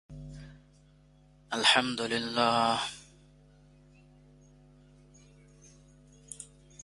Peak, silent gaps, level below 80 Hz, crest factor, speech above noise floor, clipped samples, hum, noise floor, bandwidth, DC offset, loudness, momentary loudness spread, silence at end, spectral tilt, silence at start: -6 dBFS; none; -62 dBFS; 28 dB; 32 dB; under 0.1%; 50 Hz at -55 dBFS; -60 dBFS; 11.5 kHz; under 0.1%; -27 LUFS; 25 LU; 0.4 s; -2.5 dB/octave; 0.1 s